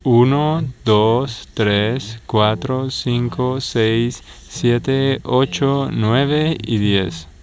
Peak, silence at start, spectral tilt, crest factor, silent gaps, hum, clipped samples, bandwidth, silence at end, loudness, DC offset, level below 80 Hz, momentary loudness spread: 0 dBFS; 0.05 s; -6.5 dB/octave; 16 dB; none; none; under 0.1%; 8 kHz; 0.15 s; -18 LUFS; under 0.1%; -42 dBFS; 6 LU